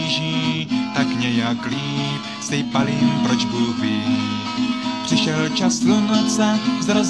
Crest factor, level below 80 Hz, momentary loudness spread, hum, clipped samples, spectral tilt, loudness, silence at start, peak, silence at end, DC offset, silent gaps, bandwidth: 16 dB; -56 dBFS; 6 LU; none; under 0.1%; -4.5 dB/octave; -20 LUFS; 0 s; -4 dBFS; 0 s; 0.1%; none; 11 kHz